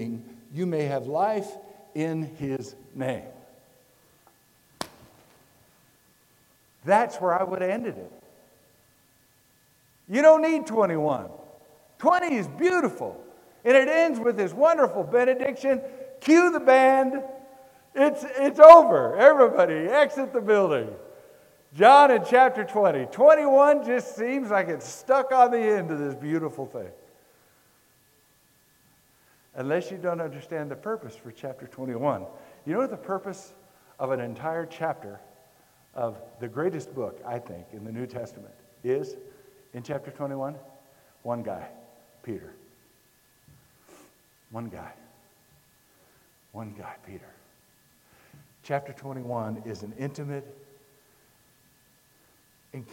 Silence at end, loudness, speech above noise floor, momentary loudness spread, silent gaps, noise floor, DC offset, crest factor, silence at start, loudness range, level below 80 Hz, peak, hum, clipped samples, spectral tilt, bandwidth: 0.1 s; -22 LUFS; 40 dB; 23 LU; none; -62 dBFS; under 0.1%; 24 dB; 0 s; 22 LU; -70 dBFS; 0 dBFS; none; under 0.1%; -6 dB/octave; 16.5 kHz